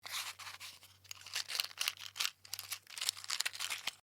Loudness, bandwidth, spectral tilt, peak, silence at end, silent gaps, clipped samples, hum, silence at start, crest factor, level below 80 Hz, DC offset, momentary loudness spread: -39 LUFS; over 20 kHz; 2.5 dB/octave; -12 dBFS; 0.05 s; none; under 0.1%; none; 0.05 s; 32 dB; -88 dBFS; under 0.1%; 13 LU